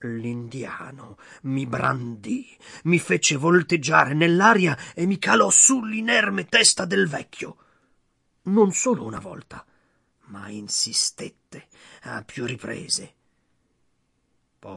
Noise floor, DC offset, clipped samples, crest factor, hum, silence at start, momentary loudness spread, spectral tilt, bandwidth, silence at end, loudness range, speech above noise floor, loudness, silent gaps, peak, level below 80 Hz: -70 dBFS; under 0.1%; under 0.1%; 22 dB; none; 0 s; 21 LU; -3 dB/octave; 11.5 kHz; 0 s; 11 LU; 47 dB; -20 LUFS; none; -2 dBFS; -64 dBFS